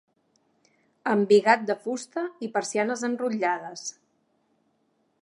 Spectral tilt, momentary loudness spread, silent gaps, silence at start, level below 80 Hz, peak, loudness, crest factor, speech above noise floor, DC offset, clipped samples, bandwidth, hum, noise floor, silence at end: -4.5 dB/octave; 14 LU; none; 1.05 s; -84 dBFS; -4 dBFS; -25 LUFS; 24 dB; 46 dB; under 0.1%; under 0.1%; 11.5 kHz; none; -71 dBFS; 1.3 s